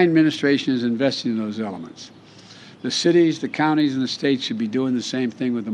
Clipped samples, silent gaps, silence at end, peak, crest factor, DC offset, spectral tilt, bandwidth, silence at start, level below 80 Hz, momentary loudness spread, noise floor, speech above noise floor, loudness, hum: under 0.1%; none; 0 s; -4 dBFS; 16 dB; under 0.1%; -5 dB/octave; 10.5 kHz; 0 s; -70 dBFS; 13 LU; -44 dBFS; 24 dB; -21 LUFS; none